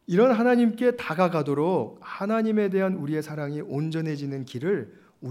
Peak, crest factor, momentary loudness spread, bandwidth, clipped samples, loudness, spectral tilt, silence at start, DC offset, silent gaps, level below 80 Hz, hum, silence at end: -8 dBFS; 16 dB; 12 LU; 14 kHz; under 0.1%; -25 LUFS; -8 dB/octave; 0.1 s; under 0.1%; none; -74 dBFS; none; 0 s